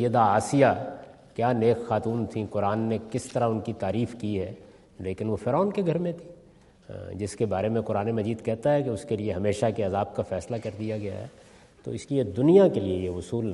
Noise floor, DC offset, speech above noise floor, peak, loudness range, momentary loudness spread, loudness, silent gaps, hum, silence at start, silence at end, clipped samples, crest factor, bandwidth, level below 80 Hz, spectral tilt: -55 dBFS; under 0.1%; 29 dB; -6 dBFS; 4 LU; 15 LU; -26 LUFS; none; none; 0 s; 0 s; under 0.1%; 20 dB; 11.5 kHz; -60 dBFS; -7 dB/octave